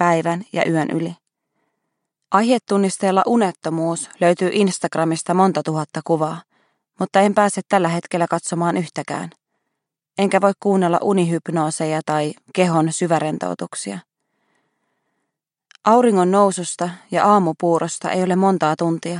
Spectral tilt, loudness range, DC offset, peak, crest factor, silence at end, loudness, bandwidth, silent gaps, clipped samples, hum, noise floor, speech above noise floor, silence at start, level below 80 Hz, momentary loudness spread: -5.5 dB/octave; 4 LU; under 0.1%; -2 dBFS; 18 dB; 0 s; -19 LUFS; 11 kHz; none; under 0.1%; none; -79 dBFS; 61 dB; 0 s; -72 dBFS; 10 LU